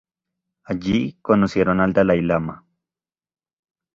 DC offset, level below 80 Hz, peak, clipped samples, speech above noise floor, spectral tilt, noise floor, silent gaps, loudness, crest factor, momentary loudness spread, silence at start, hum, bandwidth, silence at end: under 0.1%; -48 dBFS; -2 dBFS; under 0.1%; over 71 dB; -8 dB/octave; under -90 dBFS; none; -20 LUFS; 20 dB; 10 LU; 0.7 s; none; 7.4 kHz; 1.4 s